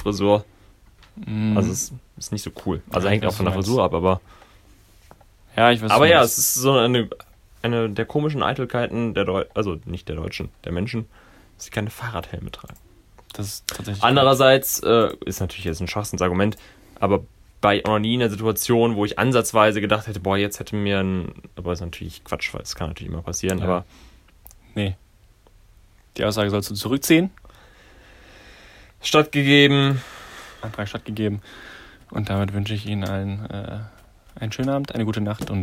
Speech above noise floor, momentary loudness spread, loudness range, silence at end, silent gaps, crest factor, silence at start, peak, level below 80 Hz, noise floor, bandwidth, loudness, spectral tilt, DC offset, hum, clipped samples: 32 dB; 17 LU; 10 LU; 0 s; none; 22 dB; 0 s; 0 dBFS; -46 dBFS; -54 dBFS; 16 kHz; -21 LUFS; -4.5 dB/octave; under 0.1%; none; under 0.1%